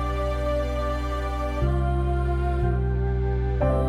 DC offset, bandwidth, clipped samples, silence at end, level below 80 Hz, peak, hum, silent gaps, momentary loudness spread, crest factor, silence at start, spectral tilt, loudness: under 0.1%; 7.4 kHz; under 0.1%; 0 s; -26 dBFS; -12 dBFS; none; none; 3 LU; 12 dB; 0 s; -8 dB/octave; -26 LUFS